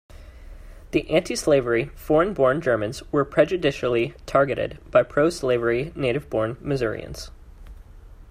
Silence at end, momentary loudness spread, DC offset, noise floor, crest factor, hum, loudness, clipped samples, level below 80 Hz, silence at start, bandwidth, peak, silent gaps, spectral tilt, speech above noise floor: 0 s; 7 LU; under 0.1%; -44 dBFS; 18 dB; none; -23 LUFS; under 0.1%; -44 dBFS; 0.15 s; 15.5 kHz; -4 dBFS; none; -5.5 dB/octave; 22 dB